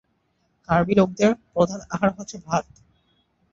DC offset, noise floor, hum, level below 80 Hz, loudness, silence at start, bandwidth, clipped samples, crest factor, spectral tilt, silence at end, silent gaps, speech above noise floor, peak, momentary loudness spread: under 0.1%; -69 dBFS; none; -52 dBFS; -22 LUFS; 0.7 s; 7.6 kHz; under 0.1%; 20 dB; -6.5 dB/octave; 0.9 s; none; 47 dB; -4 dBFS; 8 LU